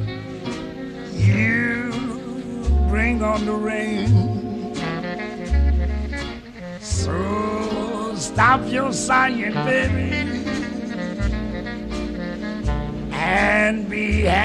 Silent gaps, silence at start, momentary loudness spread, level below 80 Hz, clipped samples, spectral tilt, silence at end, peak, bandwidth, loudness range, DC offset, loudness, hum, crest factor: none; 0 s; 12 LU; -28 dBFS; under 0.1%; -5.5 dB/octave; 0 s; -4 dBFS; 11 kHz; 4 LU; under 0.1%; -22 LUFS; none; 18 dB